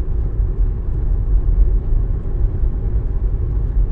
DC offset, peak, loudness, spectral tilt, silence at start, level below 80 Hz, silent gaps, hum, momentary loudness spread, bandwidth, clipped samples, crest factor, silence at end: under 0.1%; -2 dBFS; -21 LUFS; -12 dB/octave; 0 s; -16 dBFS; none; none; 4 LU; 1.9 kHz; under 0.1%; 14 dB; 0 s